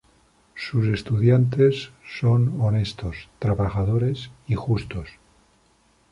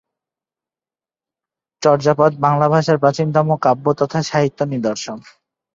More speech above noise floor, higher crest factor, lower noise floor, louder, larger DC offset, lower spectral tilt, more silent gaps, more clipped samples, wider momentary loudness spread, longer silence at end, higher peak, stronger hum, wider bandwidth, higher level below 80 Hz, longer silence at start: second, 39 dB vs over 74 dB; about the same, 16 dB vs 16 dB; second, -61 dBFS vs under -90 dBFS; second, -23 LUFS vs -16 LUFS; neither; first, -8.5 dB/octave vs -6.5 dB/octave; neither; neither; first, 16 LU vs 8 LU; first, 1 s vs 0.55 s; second, -6 dBFS vs -2 dBFS; neither; first, 10.5 kHz vs 7.8 kHz; first, -42 dBFS vs -58 dBFS; second, 0.55 s vs 1.8 s